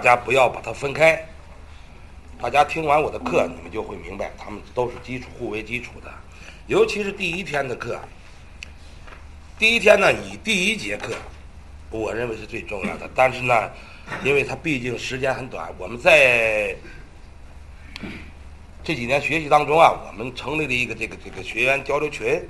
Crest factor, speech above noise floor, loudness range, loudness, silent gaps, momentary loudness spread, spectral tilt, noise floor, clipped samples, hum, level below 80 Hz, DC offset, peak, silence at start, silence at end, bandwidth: 22 dB; 21 dB; 6 LU; -21 LUFS; none; 20 LU; -4 dB/octave; -42 dBFS; under 0.1%; none; -44 dBFS; 0.4%; 0 dBFS; 0 s; 0 s; 12.5 kHz